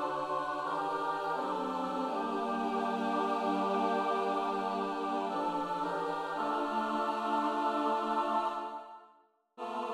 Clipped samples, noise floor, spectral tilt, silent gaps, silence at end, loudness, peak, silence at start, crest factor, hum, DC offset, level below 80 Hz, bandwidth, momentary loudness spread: under 0.1%; -66 dBFS; -5.5 dB/octave; none; 0 s; -33 LUFS; -20 dBFS; 0 s; 14 dB; none; under 0.1%; -74 dBFS; 14.5 kHz; 4 LU